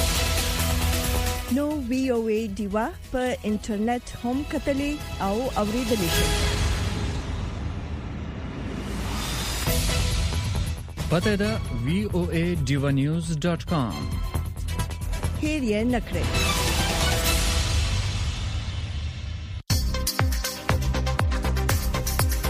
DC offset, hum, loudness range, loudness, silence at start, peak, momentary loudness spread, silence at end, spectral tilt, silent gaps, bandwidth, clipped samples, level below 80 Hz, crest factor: under 0.1%; none; 4 LU; -26 LUFS; 0 s; -8 dBFS; 9 LU; 0 s; -4.5 dB/octave; none; 15.5 kHz; under 0.1%; -30 dBFS; 18 dB